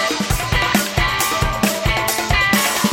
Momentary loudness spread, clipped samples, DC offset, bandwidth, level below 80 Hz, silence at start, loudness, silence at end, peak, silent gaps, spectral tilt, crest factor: 3 LU; under 0.1%; under 0.1%; 17 kHz; -28 dBFS; 0 s; -17 LUFS; 0 s; -2 dBFS; none; -3 dB/octave; 16 dB